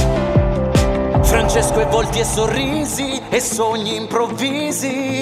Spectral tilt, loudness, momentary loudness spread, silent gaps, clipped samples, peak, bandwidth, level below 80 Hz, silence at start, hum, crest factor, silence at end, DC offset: -4.5 dB/octave; -17 LUFS; 5 LU; none; under 0.1%; -2 dBFS; 16 kHz; -26 dBFS; 0 s; none; 14 dB; 0 s; under 0.1%